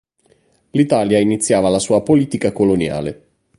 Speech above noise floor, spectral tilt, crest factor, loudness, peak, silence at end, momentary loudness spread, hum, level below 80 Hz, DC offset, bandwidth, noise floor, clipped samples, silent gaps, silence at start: 42 dB; -5.5 dB/octave; 16 dB; -16 LUFS; -2 dBFS; 0.45 s; 8 LU; none; -46 dBFS; under 0.1%; 11.5 kHz; -58 dBFS; under 0.1%; none; 0.75 s